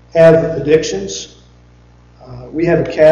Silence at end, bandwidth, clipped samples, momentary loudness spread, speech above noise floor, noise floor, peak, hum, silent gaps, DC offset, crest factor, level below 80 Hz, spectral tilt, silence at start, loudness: 0 s; 7.6 kHz; under 0.1%; 18 LU; 33 dB; -44 dBFS; 0 dBFS; 60 Hz at -45 dBFS; none; under 0.1%; 14 dB; -40 dBFS; -6 dB/octave; 0.15 s; -13 LUFS